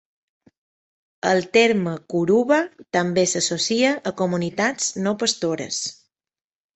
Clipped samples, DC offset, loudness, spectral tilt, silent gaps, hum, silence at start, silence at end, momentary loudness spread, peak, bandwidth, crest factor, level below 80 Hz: under 0.1%; under 0.1%; -21 LUFS; -3.5 dB/octave; none; none; 1.25 s; 0.85 s; 8 LU; -2 dBFS; 8.6 kHz; 20 dB; -64 dBFS